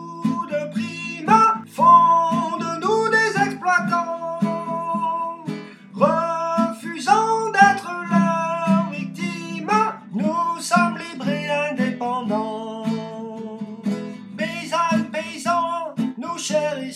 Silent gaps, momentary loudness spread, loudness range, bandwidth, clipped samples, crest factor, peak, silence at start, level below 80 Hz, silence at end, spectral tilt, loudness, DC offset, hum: none; 13 LU; 8 LU; 13.5 kHz; under 0.1%; 20 dB; 0 dBFS; 0 s; -74 dBFS; 0 s; -5 dB/octave; -21 LUFS; under 0.1%; none